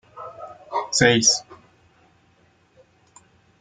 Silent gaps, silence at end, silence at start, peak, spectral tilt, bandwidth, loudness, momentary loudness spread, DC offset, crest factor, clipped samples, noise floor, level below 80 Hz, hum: none; 2.05 s; 0.15 s; -2 dBFS; -2.5 dB/octave; 11 kHz; -19 LUFS; 24 LU; under 0.1%; 24 dB; under 0.1%; -60 dBFS; -56 dBFS; none